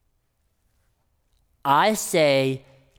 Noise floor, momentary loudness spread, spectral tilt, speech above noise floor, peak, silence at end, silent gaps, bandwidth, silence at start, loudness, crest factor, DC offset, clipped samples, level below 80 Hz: -70 dBFS; 11 LU; -4 dB/octave; 50 dB; -6 dBFS; 0.4 s; none; over 20 kHz; 1.65 s; -21 LUFS; 18 dB; under 0.1%; under 0.1%; -66 dBFS